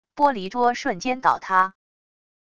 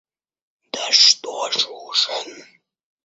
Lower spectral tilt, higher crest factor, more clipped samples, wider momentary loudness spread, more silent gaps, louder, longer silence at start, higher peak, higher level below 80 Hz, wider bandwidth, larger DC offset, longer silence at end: first, -4 dB/octave vs 2 dB/octave; about the same, 20 dB vs 22 dB; neither; second, 5 LU vs 18 LU; neither; second, -22 LUFS vs -16 LUFS; second, 0.15 s vs 0.75 s; second, -4 dBFS vs 0 dBFS; first, -60 dBFS vs -80 dBFS; first, 9.2 kHz vs 8.2 kHz; first, 0.5% vs under 0.1%; first, 0.75 s vs 0.6 s